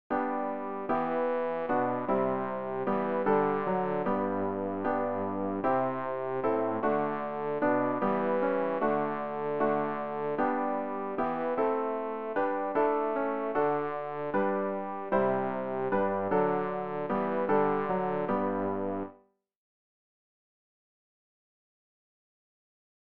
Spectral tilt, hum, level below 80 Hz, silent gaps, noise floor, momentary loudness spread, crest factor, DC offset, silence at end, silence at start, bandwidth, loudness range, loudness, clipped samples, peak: -6.5 dB/octave; none; -66 dBFS; none; -60 dBFS; 6 LU; 16 dB; 0.4%; 3.4 s; 0.1 s; 4.9 kHz; 2 LU; -30 LUFS; under 0.1%; -14 dBFS